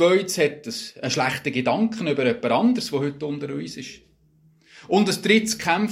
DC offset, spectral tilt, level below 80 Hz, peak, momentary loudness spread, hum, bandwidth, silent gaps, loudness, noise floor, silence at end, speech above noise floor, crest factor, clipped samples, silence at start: under 0.1%; -4.5 dB/octave; -62 dBFS; -4 dBFS; 13 LU; none; 16 kHz; none; -22 LUFS; -58 dBFS; 0 s; 36 dB; 20 dB; under 0.1%; 0 s